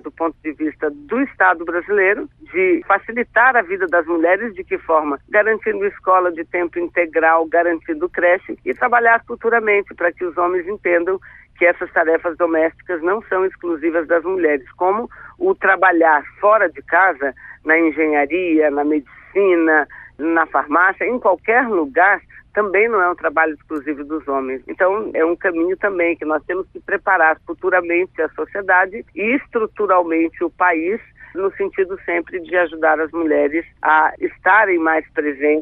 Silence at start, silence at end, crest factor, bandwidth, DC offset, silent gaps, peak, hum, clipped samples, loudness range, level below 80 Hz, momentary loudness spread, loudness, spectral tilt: 0.05 s; 0 s; 16 dB; 3.9 kHz; under 0.1%; none; -2 dBFS; none; under 0.1%; 3 LU; -54 dBFS; 9 LU; -17 LUFS; -8 dB/octave